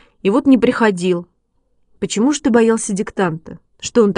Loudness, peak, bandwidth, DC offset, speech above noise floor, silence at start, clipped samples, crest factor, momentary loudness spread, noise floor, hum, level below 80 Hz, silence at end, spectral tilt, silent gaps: -16 LUFS; 0 dBFS; 11 kHz; under 0.1%; 47 dB; 0.25 s; under 0.1%; 16 dB; 10 LU; -62 dBFS; none; -52 dBFS; 0 s; -5 dB/octave; none